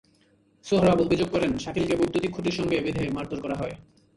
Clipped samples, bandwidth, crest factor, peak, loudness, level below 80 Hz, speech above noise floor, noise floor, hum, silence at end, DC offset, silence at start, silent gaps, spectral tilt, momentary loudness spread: under 0.1%; 11.5 kHz; 18 dB; -8 dBFS; -26 LUFS; -48 dBFS; 38 dB; -62 dBFS; none; 0.35 s; under 0.1%; 0.65 s; none; -6.5 dB/octave; 11 LU